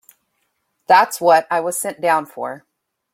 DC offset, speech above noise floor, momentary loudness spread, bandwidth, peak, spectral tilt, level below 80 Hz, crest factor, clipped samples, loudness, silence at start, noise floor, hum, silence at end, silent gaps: under 0.1%; 53 dB; 15 LU; 16.5 kHz; -2 dBFS; -2.5 dB/octave; -70 dBFS; 18 dB; under 0.1%; -16 LUFS; 0.9 s; -70 dBFS; none; 0.55 s; none